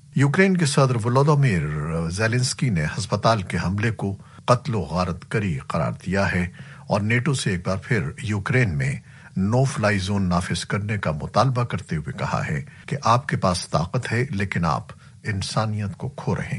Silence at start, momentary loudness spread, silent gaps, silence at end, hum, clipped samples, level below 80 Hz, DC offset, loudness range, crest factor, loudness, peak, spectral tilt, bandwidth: 0.15 s; 9 LU; none; 0 s; none; under 0.1%; -46 dBFS; under 0.1%; 3 LU; 20 dB; -23 LUFS; -2 dBFS; -6 dB/octave; 11.5 kHz